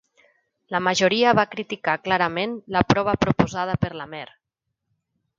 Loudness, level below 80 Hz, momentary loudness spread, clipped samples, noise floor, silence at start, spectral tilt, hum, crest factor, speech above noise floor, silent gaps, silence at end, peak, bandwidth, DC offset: -22 LUFS; -48 dBFS; 11 LU; under 0.1%; -81 dBFS; 0.7 s; -5 dB/octave; none; 24 dB; 59 dB; none; 1.15 s; 0 dBFS; 7.6 kHz; under 0.1%